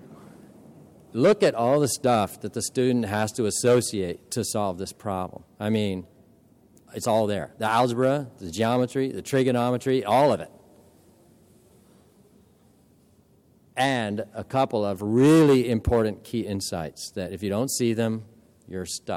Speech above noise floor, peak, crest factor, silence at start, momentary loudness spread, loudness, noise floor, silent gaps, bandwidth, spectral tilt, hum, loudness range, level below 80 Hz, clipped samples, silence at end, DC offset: 35 dB; -10 dBFS; 14 dB; 0.05 s; 12 LU; -24 LUFS; -59 dBFS; none; 16.5 kHz; -5.5 dB/octave; none; 7 LU; -50 dBFS; under 0.1%; 0 s; under 0.1%